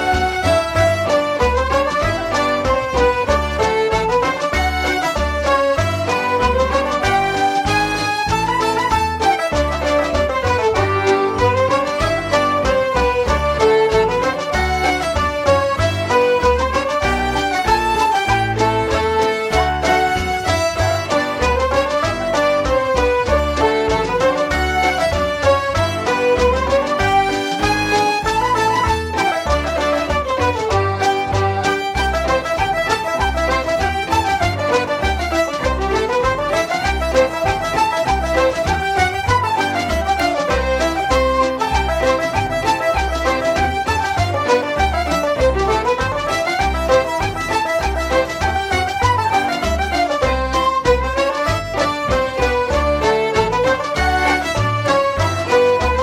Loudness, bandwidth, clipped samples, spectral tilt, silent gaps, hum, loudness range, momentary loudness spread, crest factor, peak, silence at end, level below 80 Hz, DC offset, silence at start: -17 LUFS; 16.5 kHz; under 0.1%; -4.5 dB/octave; none; none; 1 LU; 3 LU; 14 dB; -2 dBFS; 0 s; -28 dBFS; under 0.1%; 0 s